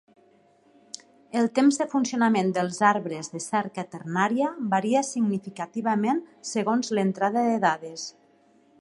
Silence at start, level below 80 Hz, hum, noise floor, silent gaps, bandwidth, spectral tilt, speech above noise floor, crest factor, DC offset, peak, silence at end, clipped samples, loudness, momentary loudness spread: 1.35 s; -76 dBFS; none; -60 dBFS; none; 11.5 kHz; -5 dB/octave; 35 dB; 20 dB; under 0.1%; -6 dBFS; 0.7 s; under 0.1%; -25 LUFS; 13 LU